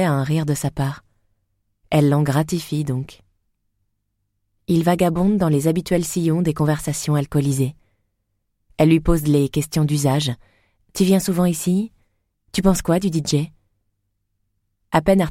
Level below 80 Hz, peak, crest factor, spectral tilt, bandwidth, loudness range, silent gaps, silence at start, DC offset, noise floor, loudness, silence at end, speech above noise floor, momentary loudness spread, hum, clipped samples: -38 dBFS; -4 dBFS; 16 dB; -6 dB/octave; 16.5 kHz; 4 LU; none; 0 s; under 0.1%; -72 dBFS; -20 LUFS; 0 s; 54 dB; 9 LU; 50 Hz at -40 dBFS; under 0.1%